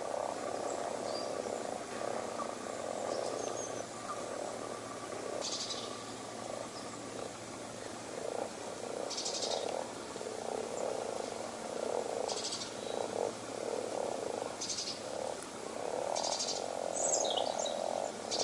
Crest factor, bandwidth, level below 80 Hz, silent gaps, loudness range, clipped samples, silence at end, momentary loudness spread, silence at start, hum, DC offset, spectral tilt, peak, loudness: 20 dB; 11.5 kHz; -74 dBFS; none; 6 LU; under 0.1%; 0 s; 8 LU; 0 s; none; under 0.1%; -2 dB/octave; -18 dBFS; -38 LUFS